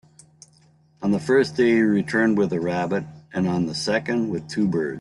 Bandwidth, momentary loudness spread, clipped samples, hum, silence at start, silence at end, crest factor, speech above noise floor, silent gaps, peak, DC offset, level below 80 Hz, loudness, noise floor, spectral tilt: 11.5 kHz; 8 LU; under 0.1%; none; 1 s; 0 s; 16 dB; 36 dB; none; -8 dBFS; under 0.1%; -60 dBFS; -22 LUFS; -57 dBFS; -6 dB/octave